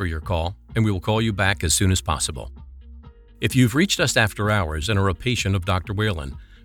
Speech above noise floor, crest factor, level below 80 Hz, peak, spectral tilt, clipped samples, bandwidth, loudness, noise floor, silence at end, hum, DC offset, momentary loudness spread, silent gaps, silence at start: 22 dB; 20 dB; -38 dBFS; -2 dBFS; -4.5 dB/octave; under 0.1%; 18.5 kHz; -22 LUFS; -44 dBFS; 0.1 s; none; under 0.1%; 8 LU; none; 0 s